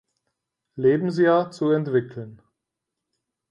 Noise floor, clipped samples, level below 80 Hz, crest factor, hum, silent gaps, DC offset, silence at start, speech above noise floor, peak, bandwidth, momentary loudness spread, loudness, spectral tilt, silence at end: -84 dBFS; under 0.1%; -70 dBFS; 16 dB; none; none; under 0.1%; 0.75 s; 62 dB; -8 dBFS; 9.6 kHz; 20 LU; -22 LUFS; -8 dB/octave; 1.15 s